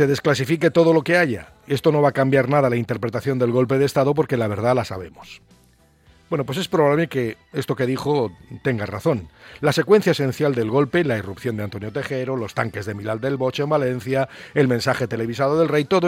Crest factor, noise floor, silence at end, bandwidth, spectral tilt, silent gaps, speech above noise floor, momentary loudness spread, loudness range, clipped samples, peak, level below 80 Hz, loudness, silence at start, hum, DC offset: 18 dB; -56 dBFS; 0 s; 16.5 kHz; -6.5 dB/octave; none; 36 dB; 10 LU; 5 LU; under 0.1%; -4 dBFS; -56 dBFS; -21 LUFS; 0 s; none; under 0.1%